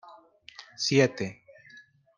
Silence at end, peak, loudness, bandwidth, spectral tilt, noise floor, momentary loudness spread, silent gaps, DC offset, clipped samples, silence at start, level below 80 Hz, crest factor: 0.85 s; -8 dBFS; -26 LUFS; 10 kHz; -4.5 dB/octave; -55 dBFS; 24 LU; none; under 0.1%; under 0.1%; 0.6 s; -72 dBFS; 22 dB